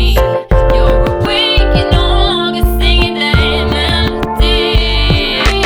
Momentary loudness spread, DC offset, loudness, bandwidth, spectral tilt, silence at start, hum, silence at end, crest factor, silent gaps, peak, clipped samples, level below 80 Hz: 3 LU; under 0.1%; -11 LUFS; over 20 kHz; -5.5 dB/octave; 0 s; none; 0 s; 10 dB; none; 0 dBFS; under 0.1%; -14 dBFS